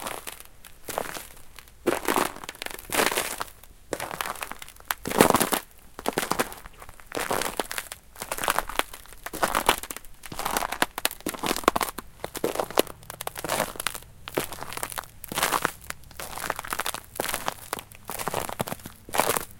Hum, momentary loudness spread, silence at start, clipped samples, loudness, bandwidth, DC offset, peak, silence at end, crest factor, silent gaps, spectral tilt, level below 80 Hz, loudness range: none; 15 LU; 0 s; under 0.1%; -28 LUFS; 17 kHz; under 0.1%; 0 dBFS; 0 s; 30 dB; none; -2.5 dB/octave; -50 dBFS; 4 LU